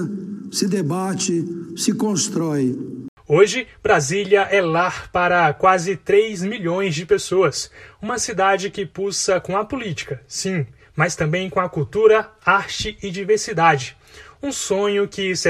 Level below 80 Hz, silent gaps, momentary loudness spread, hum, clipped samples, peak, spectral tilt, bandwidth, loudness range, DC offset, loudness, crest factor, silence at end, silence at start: -50 dBFS; 3.08-3.17 s; 12 LU; none; under 0.1%; -2 dBFS; -4 dB/octave; 14 kHz; 5 LU; under 0.1%; -20 LUFS; 18 dB; 0 s; 0 s